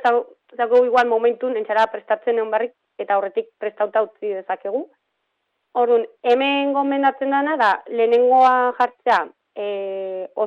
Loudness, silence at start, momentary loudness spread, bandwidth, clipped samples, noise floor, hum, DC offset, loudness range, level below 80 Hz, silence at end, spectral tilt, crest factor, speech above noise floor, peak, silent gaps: -20 LUFS; 0 s; 12 LU; 7.4 kHz; under 0.1%; -74 dBFS; none; under 0.1%; 6 LU; -72 dBFS; 0 s; -4.5 dB/octave; 16 dB; 55 dB; -4 dBFS; none